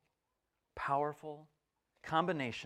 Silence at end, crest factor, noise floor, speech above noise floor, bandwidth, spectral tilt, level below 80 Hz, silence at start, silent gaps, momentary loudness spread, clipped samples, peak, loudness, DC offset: 0 s; 22 dB; -86 dBFS; 49 dB; 14 kHz; -6 dB/octave; -70 dBFS; 0.75 s; none; 19 LU; under 0.1%; -18 dBFS; -36 LUFS; under 0.1%